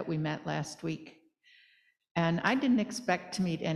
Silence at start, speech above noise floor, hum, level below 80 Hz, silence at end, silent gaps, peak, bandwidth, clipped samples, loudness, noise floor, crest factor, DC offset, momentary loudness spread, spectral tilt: 0 s; 36 dB; none; -68 dBFS; 0 s; 2.11-2.15 s; -12 dBFS; 13 kHz; under 0.1%; -32 LUFS; -67 dBFS; 20 dB; under 0.1%; 10 LU; -5.5 dB/octave